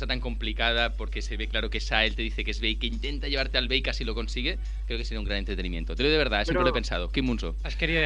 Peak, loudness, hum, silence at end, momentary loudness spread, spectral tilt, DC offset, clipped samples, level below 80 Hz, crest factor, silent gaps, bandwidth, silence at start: -6 dBFS; -28 LUFS; none; 0 s; 8 LU; -5 dB/octave; under 0.1%; under 0.1%; -30 dBFS; 20 dB; none; 8.4 kHz; 0 s